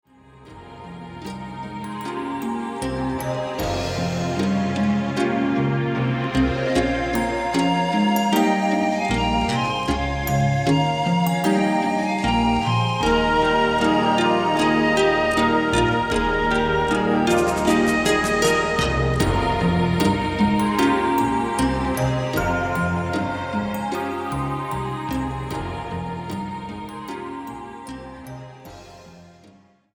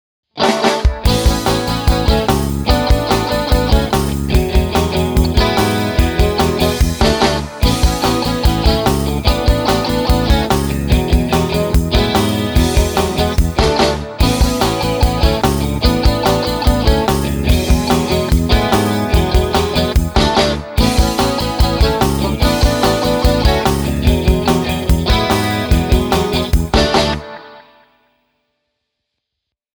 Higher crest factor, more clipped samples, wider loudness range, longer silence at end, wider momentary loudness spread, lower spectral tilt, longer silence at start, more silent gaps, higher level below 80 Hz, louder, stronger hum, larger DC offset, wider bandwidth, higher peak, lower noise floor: about the same, 16 dB vs 14 dB; neither; first, 10 LU vs 1 LU; second, 0.65 s vs 2.15 s; first, 14 LU vs 3 LU; about the same, -5.5 dB/octave vs -5.5 dB/octave; about the same, 0.35 s vs 0.35 s; neither; second, -38 dBFS vs -18 dBFS; second, -21 LUFS vs -15 LUFS; neither; neither; about the same, over 20 kHz vs over 20 kHz; second, -6 dBFS vs 0 dBFS; second, -52 dBFS vs -79 dBFS